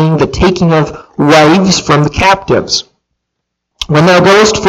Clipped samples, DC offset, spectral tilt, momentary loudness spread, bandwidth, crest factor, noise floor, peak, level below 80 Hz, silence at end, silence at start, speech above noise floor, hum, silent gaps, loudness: 0.2%; under 0.1%; -5 dB/octave; 9 LU; 14 kHz; 8 dB; -72 dBFS; 0 dBFS; -30 dBFS; 0 s; 0 s; 64 dB; none; none; -8 LUFS